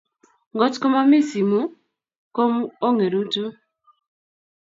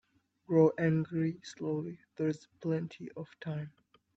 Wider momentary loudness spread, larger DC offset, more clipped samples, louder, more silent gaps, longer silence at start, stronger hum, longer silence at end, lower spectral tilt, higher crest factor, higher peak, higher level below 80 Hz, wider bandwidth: second, 14 LU vs 17 LU; neither; neither; first, -21 LUFS vs -33 LUFS; first, 2.18-2.31 s vs none; about the same, 0.55 s vs 0.5 s; neither; first, 1.25 s vs 0.5 s; second, -6 dB/octave vs -8 dB/octave; about the same, 18 dB vs 20 dB; first, -4 dBFS vs -14 dBFS; about the same, -74 dBFS vs -74 dBFS; about the same, 7.8 kHz vs 7.8 kHz